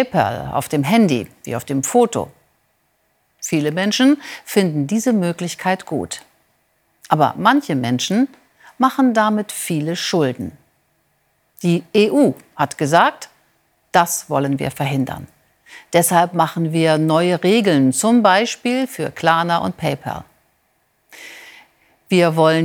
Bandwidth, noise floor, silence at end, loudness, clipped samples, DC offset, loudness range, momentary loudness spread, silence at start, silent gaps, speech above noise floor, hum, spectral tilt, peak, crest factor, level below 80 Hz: 19 kHz; -64 dBFS; 0 s; -17 LUFS; under 0.1%; under 0.1%; 5 LU; 12 LU; 0 s; none; 47 dB; none; -5 dB/octave; 0 dBFS; 18 dB; -58 dBFS